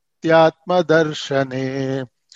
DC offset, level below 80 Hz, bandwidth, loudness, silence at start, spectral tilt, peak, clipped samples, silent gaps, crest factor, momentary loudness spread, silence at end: under 0.1%; -64 dBFS; 7.8 kHz; -18 LUFS; 0.25 s; -6 dB/octave; -2 dBFS; under 0.1%; none; 16 dB; 10 LU; 0.3 s